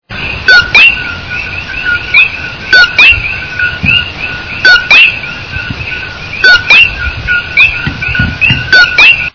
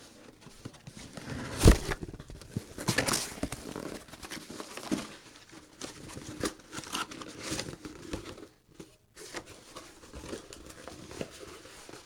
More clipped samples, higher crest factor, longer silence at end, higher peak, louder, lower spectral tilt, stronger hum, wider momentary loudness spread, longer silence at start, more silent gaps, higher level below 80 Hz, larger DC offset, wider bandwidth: first, 5% vs under 0.1%; second, 8 dB vs 32 dB; about the same, 0.05 s vs 0 s; first, 0 dBFS vs -4 dBFS; first, -5 LUFS vs -34 LUFS; second, -3 dB/octave vs -4.5 dB/octave; neither; second, 15 LU vs 21 LU; about the same, 0.1 s vs 0 s; neither; first, -28 dBFS vs -40 dBFS; first, 1% vs under 0.1%; second, 5.4 kHz vs 19 kHz